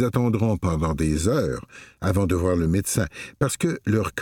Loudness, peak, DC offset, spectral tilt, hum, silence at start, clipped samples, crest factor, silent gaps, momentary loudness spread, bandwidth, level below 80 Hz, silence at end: -23 LUFS; -6 dBFS; under 0.1%; -6 dB/octave; none; 0 s; under 0.1%; 16 dB; none; 7 LU; 18.5 kHz; -38 dBFS; 0 s